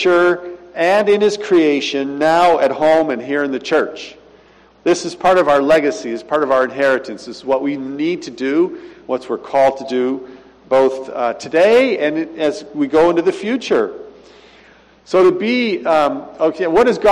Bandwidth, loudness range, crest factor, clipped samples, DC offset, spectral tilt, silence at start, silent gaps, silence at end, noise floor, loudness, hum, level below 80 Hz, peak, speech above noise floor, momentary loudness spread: 11.5 kHz; 4 LU; 12 dB; under 0.1%; under 0.1%; -5 dB/octave; 0 s; none; 0 s; -48 dBFS; -16 LUFS; none; -54 dBFS; -4 dBFS; 33 dB; 10 LU